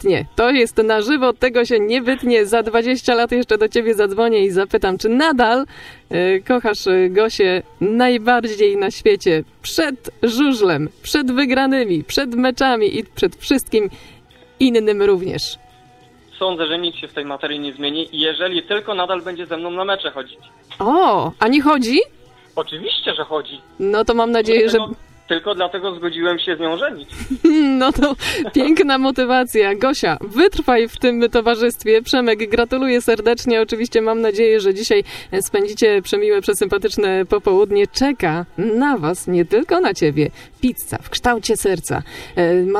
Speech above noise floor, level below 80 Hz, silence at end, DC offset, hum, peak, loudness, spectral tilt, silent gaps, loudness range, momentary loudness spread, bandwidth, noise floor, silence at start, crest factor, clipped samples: 31 dB; -42 dBFS; 0 s; under 0.1%; none; 0 dBFS; -17 LUFS; -4.5 dB/octave; none; 4 LU; 8 LU; 14.5 kHz; -48 dBFS; 0 s; 16 dB; under 0.1%